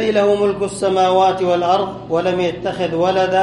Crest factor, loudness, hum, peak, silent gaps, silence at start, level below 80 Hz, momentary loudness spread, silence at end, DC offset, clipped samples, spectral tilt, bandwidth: 14 dB; -17 LUFS; none; -2 dBFS; none; 0 s; -48 dBFS; 6 LU; 0 s; under 0.1%; under 0.1%; -5.5 dB/octave; 11.5 kHz